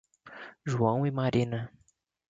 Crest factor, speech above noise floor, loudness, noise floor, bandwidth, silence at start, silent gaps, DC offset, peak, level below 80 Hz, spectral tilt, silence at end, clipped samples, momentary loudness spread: 20 dB; 21 dB; -30 LUFS; -49 dBFS; 7.8 kHz; 0.25 s; none; under 0.1%; -12 dBFS; -60 dBFS; -7.5 dB/octave; 0.6 s; under 0.1%; 19 LU